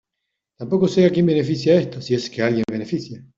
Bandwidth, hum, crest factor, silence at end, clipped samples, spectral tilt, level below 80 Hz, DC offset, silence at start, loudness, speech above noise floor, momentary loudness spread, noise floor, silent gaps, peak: 7.6 kHz; none; 16 dB; 0.15 s; under 0.1%; -7 dB/octave; -58 dBFS; under 0.1%; 0.6 s; -19 LUFS; 61 dB; 11 LU; -80 dBFS; none; -4 dBFS